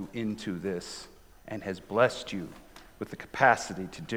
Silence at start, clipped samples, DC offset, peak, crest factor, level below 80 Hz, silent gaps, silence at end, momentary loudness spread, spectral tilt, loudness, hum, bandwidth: 0 s; under 0.1%; under 0.1%; -6 dBFS; 24 dB; -60 dBFS; none; 0 s; 19 LU; -4.5 dB/octave; -30 LUFS; none; 19 kHz